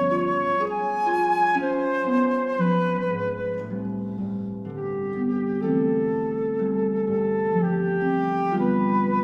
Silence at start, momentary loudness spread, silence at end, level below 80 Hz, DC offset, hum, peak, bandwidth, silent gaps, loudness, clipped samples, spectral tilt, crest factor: 0 s; 8 LU; 0 s; -60 dBFS; under 0.1%; none; -10 dBFS; 7.2 kHz; none; -24 LUFS; under 0.1%; -9 dB/octave; 14 dB